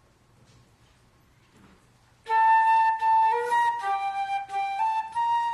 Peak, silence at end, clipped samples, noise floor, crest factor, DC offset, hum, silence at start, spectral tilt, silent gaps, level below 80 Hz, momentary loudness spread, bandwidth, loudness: -12 dBFS; 0 s; under 0.1%; -60 dBFS; 14 dB; under 0.1%; none; 2.25 s; -1.5 dB/octave; none; -68 dBFS; 9 LU; 12 kHz; -24 LUFS